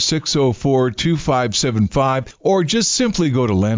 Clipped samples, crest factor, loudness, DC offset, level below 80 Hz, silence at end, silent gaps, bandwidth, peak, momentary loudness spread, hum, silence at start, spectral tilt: under 0.1%; 10 dB; -17 LUFS; under 0.1%; -38 dBFS; 0 s; none; 7.8 kHz; -6 dBFS; 3 LU; none; 0 s; -4.5 dB/octave